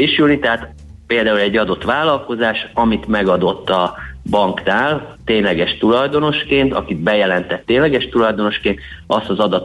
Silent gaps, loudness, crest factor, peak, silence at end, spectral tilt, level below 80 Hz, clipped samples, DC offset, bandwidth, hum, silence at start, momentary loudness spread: none; -16 LUFS; 14 dB; -2 dBFS; 0 s; -6.5 dB/octave; -40 dBFS; under 0.1%; under 0.1%; 11.5 kHz; none; 0 s; 5 LU